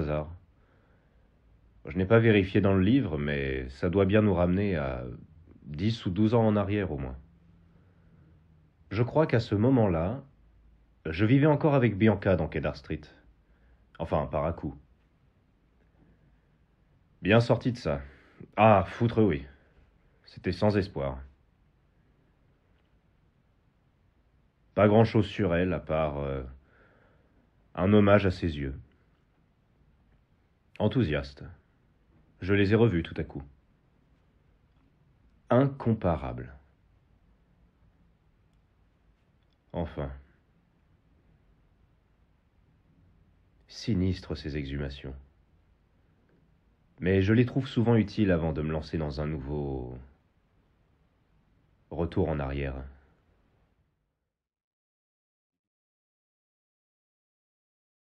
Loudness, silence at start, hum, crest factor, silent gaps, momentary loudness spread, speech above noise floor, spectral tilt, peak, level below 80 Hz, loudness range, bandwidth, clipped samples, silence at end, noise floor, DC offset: -27 LUFS; 0 s; none; 22 dB; none; 18 LU; 57 dB; -8.5 dB/octave; -8 dBFS; -48 dBFS; 11 LU; 7.8 kHz; under 0.1%; 5.15 s; -83 dBFS; under 0.1%